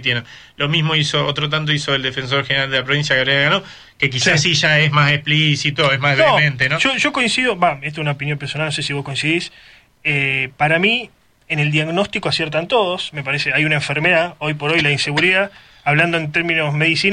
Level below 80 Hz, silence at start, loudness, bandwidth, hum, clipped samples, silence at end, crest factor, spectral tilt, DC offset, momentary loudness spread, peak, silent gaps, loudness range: -50 dBFS; 0 s; -16 LUFS; 10 kHz; none; under 0.1%; 0 s; 16 dB; -4 dB/octave; under 0.1%; 8 LU; -2 dBFS; none; 4 LU